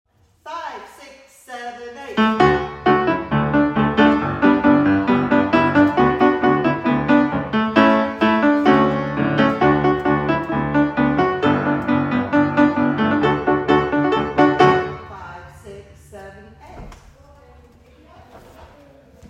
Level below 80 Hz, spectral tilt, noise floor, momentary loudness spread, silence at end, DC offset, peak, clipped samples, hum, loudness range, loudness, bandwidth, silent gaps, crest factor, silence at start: -44 dBFS; -7.5 dB/octave; -48 dBFS; 16 LU; 0 s; under 0.1%; 0 dBFS; under 0.1%; none; 5 LU; -17 LUFS; 8 kHz; none; 18 dB; 0.45 s